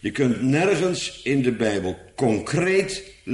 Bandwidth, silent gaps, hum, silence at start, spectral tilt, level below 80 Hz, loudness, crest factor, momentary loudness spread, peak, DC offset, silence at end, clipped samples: 11.5 kHz; none; none; 0.05 s; -5.5 dB/octave; -52 dBFS; -22 LUFS; 16 dB; 8 LU; -8 dBFS; under 0.1%; 0 s; under 0.1%